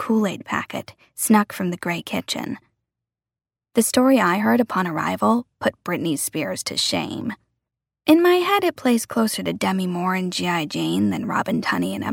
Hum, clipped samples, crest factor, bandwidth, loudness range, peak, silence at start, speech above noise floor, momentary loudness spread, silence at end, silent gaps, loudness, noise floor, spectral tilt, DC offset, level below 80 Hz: none; under 0.1%; 18 dB; 17 kHz; 4 LU; -4 dBFS; 0 s; over 69 dB; 10 LU; 0 s; none; -21 LUFS; under -90 dBFS; -4.5 dB/octave; under 0.1%; -64 dBFS